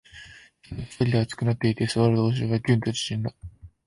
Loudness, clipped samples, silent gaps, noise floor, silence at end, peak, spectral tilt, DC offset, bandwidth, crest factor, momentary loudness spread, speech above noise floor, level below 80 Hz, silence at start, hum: -25 LUFS; under 0.1%; none; -49 dBFS; 0.2 s; -8 dBFS; -6.5 dB/octave; under 0.1%; 11.5 kHz; 16 dB; 22 LU; 25 dB; -50 dBFS; 0.15 s; none